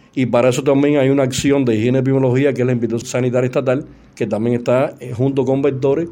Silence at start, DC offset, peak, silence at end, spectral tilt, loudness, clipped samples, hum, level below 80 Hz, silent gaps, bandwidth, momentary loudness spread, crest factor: 0.15 s; under 0.1%; -2 dBFS; 0 s; -6.5 dB/octave; -16 LUFS; under 0.1%; none; -50 dBFS; none; 16.5 kHz; 6 LU; 14 dB